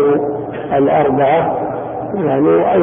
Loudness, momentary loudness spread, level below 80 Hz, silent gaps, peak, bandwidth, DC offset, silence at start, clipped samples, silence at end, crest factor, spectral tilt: -15 LUFS; 9 LU; -46 dBFS; none; -2 dBFS; 3.7 kHz; under 0.1%; 0 s; under 0.1%; 0 s; 12 dB; -13 dB/octave